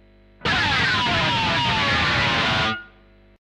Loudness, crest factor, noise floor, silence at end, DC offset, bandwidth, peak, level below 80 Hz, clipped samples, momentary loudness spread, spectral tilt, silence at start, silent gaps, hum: -19 LUFS; 14 dB; -52 dBFS; 0.6 s; under 0.1%; 12.5 kHz; -8 dBFS; -42 dBFS; under 0.1%; 5 LU; -4 dB/octave; 0.4 s; none; 50 Hz at -50 dBFS